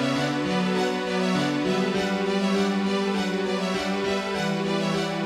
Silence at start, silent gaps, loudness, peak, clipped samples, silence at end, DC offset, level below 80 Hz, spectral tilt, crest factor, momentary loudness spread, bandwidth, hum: 0 s; none; -25 LUFS; -12 dBFS; under 0.1%; 0 s; under 0.1%; -58 dBFS; -5.5 dB/octave; 12 dB; 2 LU; 13.5 kHz; none